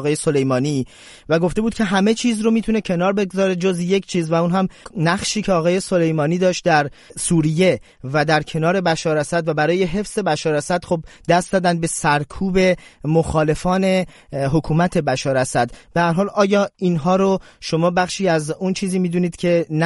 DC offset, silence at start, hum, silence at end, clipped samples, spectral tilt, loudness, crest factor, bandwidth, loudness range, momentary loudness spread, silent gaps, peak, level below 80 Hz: under 0.1%; 0 s; none; 0 s; under 0.1%; -5.5 dB/octave; -19 LUFS; 16 dB; 11.5 kHz; 1 LU; 5 LU; none; -2 dBFS; -42 dBFS